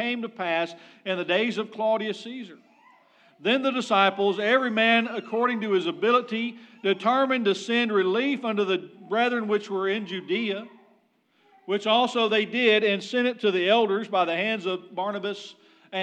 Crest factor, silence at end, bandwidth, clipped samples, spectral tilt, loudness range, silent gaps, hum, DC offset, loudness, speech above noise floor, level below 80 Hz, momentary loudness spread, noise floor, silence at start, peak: 20 dB; 0 s; 9.2 kHz; under 0.1%; -4.5 dB/octave; 5 LU; none; none; under 0.1%; -24 LUFS; 41 dB; under -90 dBFS; 10 LU; -66 dBFS; 0 s; -6 dBFS